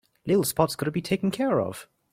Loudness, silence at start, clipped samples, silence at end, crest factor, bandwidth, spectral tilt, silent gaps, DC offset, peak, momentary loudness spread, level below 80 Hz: -26 LUFS; 0.25 s; under 0.1%; 0.3 s; 20 dB; 16.5 kHz; -5.5 dB/octave; none; under 0.1%; -6 dBFS; 7 LU; -56 dBFS